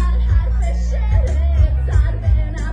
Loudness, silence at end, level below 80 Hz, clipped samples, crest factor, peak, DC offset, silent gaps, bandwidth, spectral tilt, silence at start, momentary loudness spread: -18 LUFS; 0 s; -16 dBFS; under 0.1%; 12 dB; -4 dBFS; under 0.1%; none; 7.8 kHz; -7.5 dB/octave; 0 s; 3 LU